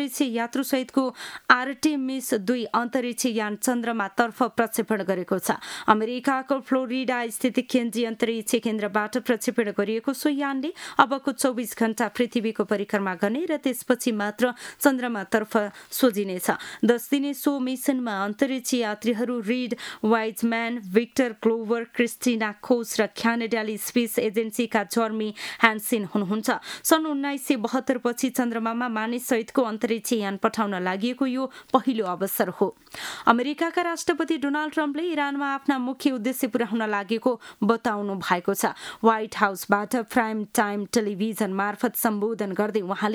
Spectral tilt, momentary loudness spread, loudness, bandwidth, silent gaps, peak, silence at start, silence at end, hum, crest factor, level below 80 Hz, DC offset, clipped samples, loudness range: -4 dB/octave; 5 LU; -25 LUFS; over 20 kHz; none; 0 dBFS; 0 s; 0 s; none; 24 dB; -70 dBFS; under 0.1%; under 0.1%; 1 LU